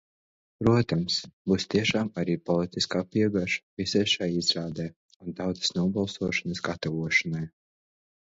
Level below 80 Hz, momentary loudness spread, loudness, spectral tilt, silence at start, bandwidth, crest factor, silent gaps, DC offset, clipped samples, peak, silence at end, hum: -54 dBFS; 9 LU; -27 LUFS; -5 dB/octave; 0.6 s; 8 kHz; 20 dB; 1.33-1.45 s, 3.63-3.77 s, 4.96-5.09 s, 5.16-5.20 s; under 0.1%; under 0.1%; -8 dBFS; 0.8 s; none